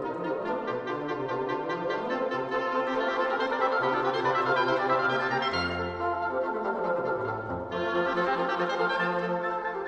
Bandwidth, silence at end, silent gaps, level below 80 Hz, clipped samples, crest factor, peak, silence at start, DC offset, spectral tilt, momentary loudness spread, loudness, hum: 8.8 kHz; 0 s; none; -60 dBFS; under 0.1%; 18 dB; -12 dBFS; 0 s; under 0.1%; -6 dB/octave; 6 LU; -28 LUFS; none